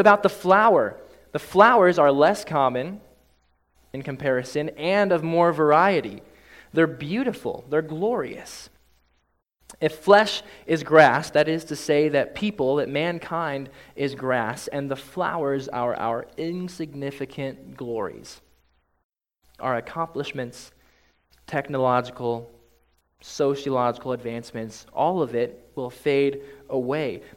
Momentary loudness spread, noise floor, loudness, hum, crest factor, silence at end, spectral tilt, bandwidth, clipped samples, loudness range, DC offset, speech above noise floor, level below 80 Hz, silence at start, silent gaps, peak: 17 LU; -70 dBFS; -23 LUFS; none; 24 dB; 0.1 s; -5.5 dB/octave; 16.5 kHz; under 0.1%; 12 LU; under 0.1%; 47 dB; -60 dBFS; 0 s; 19.04-19.09 s; 0 dBFS